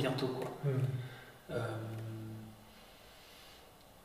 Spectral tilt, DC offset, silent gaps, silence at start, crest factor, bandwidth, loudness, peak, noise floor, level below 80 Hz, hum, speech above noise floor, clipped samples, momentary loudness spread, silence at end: -7 dB/octave; under 0.1%; none; 0 s; 18 dB; 15.5 kHz; -40 LUFS; -22 dBFS; -59 dBFS; -68 dBFS; none; 22 dB; under 0.1%; 21 LU; 0 s